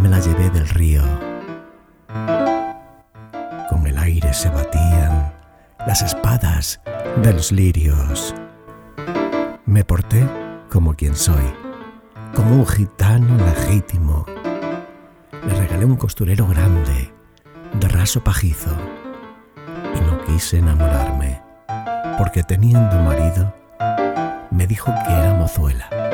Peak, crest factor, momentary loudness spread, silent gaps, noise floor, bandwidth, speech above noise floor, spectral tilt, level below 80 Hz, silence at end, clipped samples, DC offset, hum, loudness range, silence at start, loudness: -2 dBFS; 16 dB; 16 LU; none; -44 dBFS; 18 kHz; 29 dB; -6 dB/octave; -24 dBFS; 0 s; under 0.1%; under 0.1%; none; 3 LU; 0 s; -18 LUFS